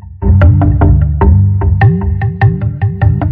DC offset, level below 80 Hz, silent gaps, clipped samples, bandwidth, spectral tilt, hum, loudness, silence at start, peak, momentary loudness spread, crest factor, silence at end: under 0.1%; -16 dBFS; none; under 0.1%; 3.7 kHz; -12 dB/octave; none; -10 LUFS; 0.05 s; 0 dBFS; 6 LU; 8 dB; 0 s